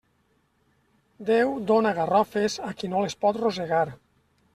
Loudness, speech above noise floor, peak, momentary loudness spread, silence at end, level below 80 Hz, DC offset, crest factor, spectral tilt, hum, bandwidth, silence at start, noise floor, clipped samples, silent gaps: -25 LUFS; 44 dB; -8 dBFS; 7 LU; 0.6 s; -64 dBFS; under 0.1%; 18 dB; -5 dB/octave; none; 13.5 kHz; 1.2 s; -68 dBFS; under 0.1%; none